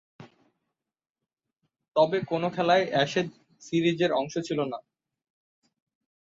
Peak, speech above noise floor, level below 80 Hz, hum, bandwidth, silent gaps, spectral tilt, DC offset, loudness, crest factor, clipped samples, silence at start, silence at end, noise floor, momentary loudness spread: -8 dBFS; 61 dB; -72 dBFS; none; 7.8 kHz; 1.10-1.15 s; -5.5 dB/octave; under 0.1%; -26 LUFS; 20 dB; under 0.1%; 0.2 s; 1.5 s; -87 dBFS; 8 LU